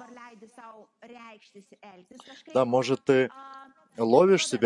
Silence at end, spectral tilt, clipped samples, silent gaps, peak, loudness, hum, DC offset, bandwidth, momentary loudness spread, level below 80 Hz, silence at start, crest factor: 0 s; -5 dB/octave; under 0.1%; none; -6 dBFS; -24 LUFS; none; under 0.1%; 11 kHz; 27 LU; -78 dBFS; 0 s; 22 dB